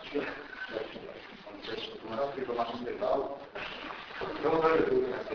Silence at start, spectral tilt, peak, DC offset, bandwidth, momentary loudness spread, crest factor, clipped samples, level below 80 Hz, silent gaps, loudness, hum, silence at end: 0 s; -3 dB/octave; -14 dBFS; under 0.1%; 5.4 kHz; 15 LU; 20 dB; under 0.1%; -60 dBFS; none; -33 LUFS; none; 0 s